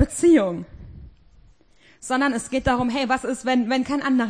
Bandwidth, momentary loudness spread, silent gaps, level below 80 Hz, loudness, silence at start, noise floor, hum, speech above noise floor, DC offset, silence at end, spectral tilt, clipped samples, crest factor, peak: 10.5 kHz; 12 LU; none; -44 dBFS; -21 LUFS; 0 s; -56 dBFS; none; 35 dB; 0.1%; 0 s; -5 dB/octave; under 0.1%; 18 dB; -4 dBFS